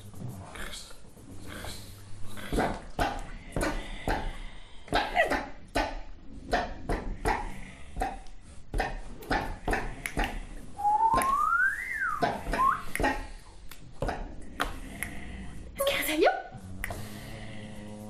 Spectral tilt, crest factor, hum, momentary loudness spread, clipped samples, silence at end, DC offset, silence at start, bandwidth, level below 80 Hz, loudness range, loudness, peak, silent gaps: -4 dB/octave; 20 dB; none; 20 LU; under 0.1%; 0 s; 0.1%; 0 s; 15.5 kHz; -40 dBFS; 7 LU; -31 LUFS; -10 dBFS; none